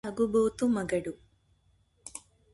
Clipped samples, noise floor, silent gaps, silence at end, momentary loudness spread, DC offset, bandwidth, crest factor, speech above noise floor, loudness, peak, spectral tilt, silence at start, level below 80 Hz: under 0.1%; -68 dBFS; none; 0.35 s; 21 LU; under 0.1%; 11.5 kHz; 16 dB; 40 dB; -29 LUFS; -16 dBFS; -6 dB/octave; 0.05 s; -60 dBFS